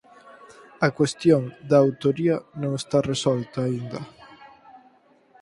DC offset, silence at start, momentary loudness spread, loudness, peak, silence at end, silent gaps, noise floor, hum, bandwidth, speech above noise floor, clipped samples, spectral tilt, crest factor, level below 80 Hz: under 0.1%; 0.25 s; 11 LU; -23 LUFS; -4 dBFS; 0.95 s; none; -57 dBFS; none; 11.5 kHz; 35 dB; under 0.1%; -6 dB/octave; 20 dB; -60 dBFS